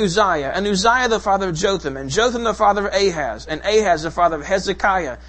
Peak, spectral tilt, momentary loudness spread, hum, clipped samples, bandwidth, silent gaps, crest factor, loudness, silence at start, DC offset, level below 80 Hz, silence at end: 0 dBFS; -3.5 dB/octave; 5 LU; none; under 0.1%; 8.8 kHz; none; 18 dB; -18 LUFS; 0 s; under 0.1%; -38 dBFS; 0 s